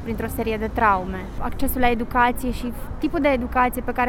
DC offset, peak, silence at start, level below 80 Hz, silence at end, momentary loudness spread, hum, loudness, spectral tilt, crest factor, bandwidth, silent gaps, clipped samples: under 0.1%; -4 dBFS; 0 s; -32 dBFS; 0 s; 10 LU; none; -23 LUFS; -5.5 dB/octave; 18 dB; 18 kHz; none; under 0.1%